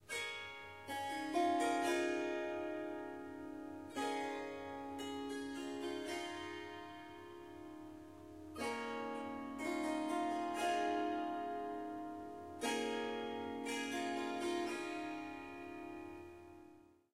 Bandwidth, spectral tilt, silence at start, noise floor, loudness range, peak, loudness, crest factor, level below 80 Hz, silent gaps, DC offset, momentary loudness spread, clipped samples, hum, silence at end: 16 kHz; -3.5 dB/octave; 0 s; -63 dBFS; 7 LU; -24 dBFS; -42 LUFS; 18 dB; -76 dBFS; none; under 0.1%; 16 LU; under 0.1%; none; 0.2 s